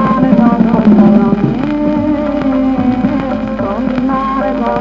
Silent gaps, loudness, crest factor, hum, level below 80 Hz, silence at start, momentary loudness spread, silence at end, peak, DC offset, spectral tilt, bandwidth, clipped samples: none; -12 LUFS; 10 dB; none; -32 dBFS; 0 s; 8 LU; 0 s; 0 dBFS; under 0.1%; -9.5 dB/octave; 5.8 kHz; under 0.1%